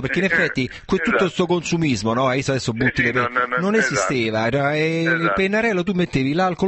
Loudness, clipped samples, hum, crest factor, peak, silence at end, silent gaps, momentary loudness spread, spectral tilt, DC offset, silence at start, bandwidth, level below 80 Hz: -19 LUFS; under 0.1%; none; 14 dB; -4 dBFS; 0 s; none; 3 LU; -5 dB/octave; under 0.1%; 0 s; 8.6 kHz; -46 dBFS